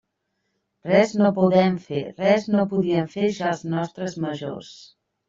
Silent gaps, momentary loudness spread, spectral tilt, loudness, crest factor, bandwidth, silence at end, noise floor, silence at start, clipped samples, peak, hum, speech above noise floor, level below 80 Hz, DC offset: none; 12 LU; -7 dB/octave; -22 LUFS; 20 dB; 7.6 kHz; 0.45 s; -76 dBFS; 0.85 s; under 0.1%; -4 dBFS; none; 54 dB; -62 dBFS; under 0.1%